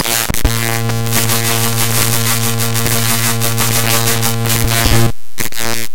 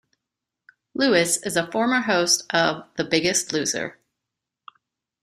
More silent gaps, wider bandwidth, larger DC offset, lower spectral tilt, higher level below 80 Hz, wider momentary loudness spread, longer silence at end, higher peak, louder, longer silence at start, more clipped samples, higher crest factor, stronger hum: neither; first, 17.5 kHz vs 15.5 kHz; first, 10% vs under 0.1%; about the same, -3 dB/octave vs -2.5 dB/octave; first, -26 dBFS vs -64 dBFS; second, 5 LU vs 9 LU; second, 0 s vs 1.3 s; first, 0 dBFS vs -4 dBFS; first, -13 LUFS vs -21 LUFS; second, 0 s vs 0.95 s; neither; second, 14 dB vs 20 dB; neither